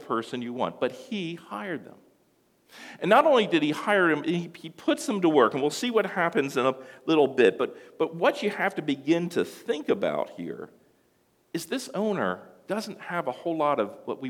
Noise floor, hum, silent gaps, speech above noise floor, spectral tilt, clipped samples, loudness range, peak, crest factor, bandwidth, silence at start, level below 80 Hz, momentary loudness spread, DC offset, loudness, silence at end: -67 dBFS; none; none; 40 dB; -5 dB/octave; under 0.1%; 7 LU; -6 dBFS; 22 dB; 16.5 kHz; 0 s; -78 dBFS; 14 LU; under 0.1%; -26 LUFS; 0 s